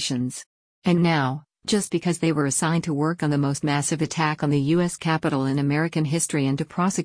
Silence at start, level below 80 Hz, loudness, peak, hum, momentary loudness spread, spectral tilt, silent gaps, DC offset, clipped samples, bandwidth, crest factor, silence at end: 0 s; -58 dBFS; -23 LUFS; -10 dBFS; none; 4 LU; -5 dB/octave; 0.46-0.82 s; under 0.1%; under 0.1%; 10.5 kHz; 14 dB; 0 s